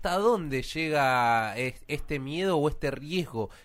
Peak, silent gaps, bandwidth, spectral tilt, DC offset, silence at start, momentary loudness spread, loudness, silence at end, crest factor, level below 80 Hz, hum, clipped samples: -12 dBFS; none; 16 kHz; -5.5 dB/octave; under 0.1%; 0 s; 9 LU; -28 LUFS; 0.05 s; 16 dB; -46 dBFS; none; under 0.1%